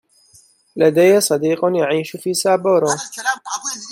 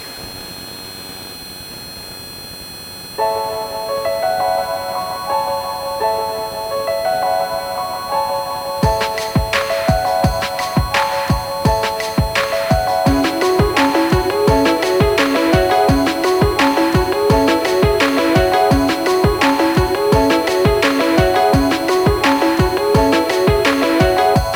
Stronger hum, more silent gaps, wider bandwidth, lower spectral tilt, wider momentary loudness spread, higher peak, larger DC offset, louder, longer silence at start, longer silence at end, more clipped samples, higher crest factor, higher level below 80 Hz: neither; neither; about the same, 16.5 kHz vs 17 kHz; about the same, -4 dB/octave vs -5 dB/octave; second, 10 LU vs 15 LU; about the same, -2 dBFS vs -2 dBFS; neither; about the same, -17 LUFS vs -16 LUFS; first, 0.75 s vs 0 s; about the same, 0 s vs 0 s; neither; about the same, 16 dB vs 12 dB; second, -68 dBFS vs -30 dBFS